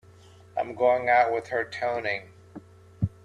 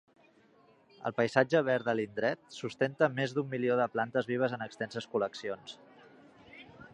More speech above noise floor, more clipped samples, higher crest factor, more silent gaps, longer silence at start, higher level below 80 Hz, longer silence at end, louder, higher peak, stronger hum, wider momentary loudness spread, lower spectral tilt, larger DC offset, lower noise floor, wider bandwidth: second, 27 dB vs 32 dB; neither; second, 18 dB vs 24 dB; neither; second, 0.55 s vs 1 s; first, -58 dBFS vs -76 dBFS; about the same, 0.15 s vs 0.05 s; first, -26 LUFS vs -32 LUFS; about the same, -8 dBFS vs -8 dBFS; neither; second, 12 LU vs 15 LU; about the same, -6.5 dB/octave vs -6 dB/octave; neither; second, -52 dBFS vs -64 dBFS; about the same, 10 kHz vs 10 kHz